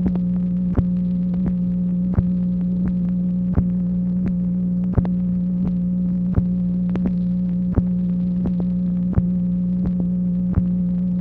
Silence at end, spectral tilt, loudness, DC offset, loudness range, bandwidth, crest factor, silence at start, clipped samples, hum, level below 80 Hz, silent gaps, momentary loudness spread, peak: 0 s; -12.5 dB/octave; -21 LUFS; under 0.1%; 0 LU; 2.4 kHz; 16 dB; 0 s; under 0.1%; 60 Hz at -20 dBFS; -34 dBFS; none; 1 LU; -2 dBFS